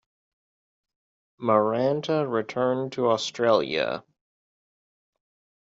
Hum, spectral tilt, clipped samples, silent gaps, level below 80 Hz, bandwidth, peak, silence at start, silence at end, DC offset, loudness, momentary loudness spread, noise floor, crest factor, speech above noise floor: none; -4 dB/octave; under 0.1%; none; -72 dBFS; 7.8 kHz; -6 dBFS; 1.4 s; 1.65 s; under 0.1%; -25 LUFS; 6 LU; under -90 dBFS; 22 dB; over 66 dB